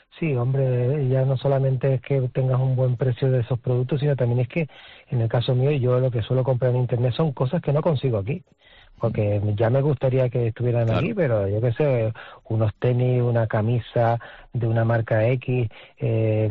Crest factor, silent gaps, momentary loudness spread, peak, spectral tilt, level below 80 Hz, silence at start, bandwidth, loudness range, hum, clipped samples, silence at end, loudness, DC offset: 10 dB; none; 5 LU; -10 dBFS; -8 dB/octave; -52 dBFS; 0.15 s; 4.5 kHz; 1 LU; none; under 0.1%; 0 s; -23 LUFS; under 0.1%